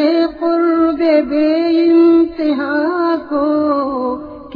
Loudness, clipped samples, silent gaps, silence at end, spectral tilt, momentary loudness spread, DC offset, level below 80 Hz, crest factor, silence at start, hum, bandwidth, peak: -14 LUFS; under 0.1%; none; 0 s; -7.5 dB/octave; 7 LU; under 0.1%; -48 dBFS; 12 dB; 0 s; none; 5 kHz; -2 dBFS